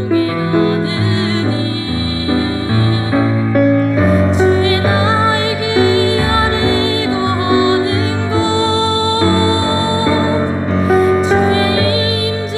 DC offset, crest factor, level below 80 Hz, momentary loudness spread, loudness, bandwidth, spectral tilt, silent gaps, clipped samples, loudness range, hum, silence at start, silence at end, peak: under 0.1%; 10 dB; -36 dBFS; 4 LU; -14 LUFS; 11.5 kHz; -6 dB/octave; none; under 0.1%; 2 LU; none; 0 s; 0 s; -4 dBFS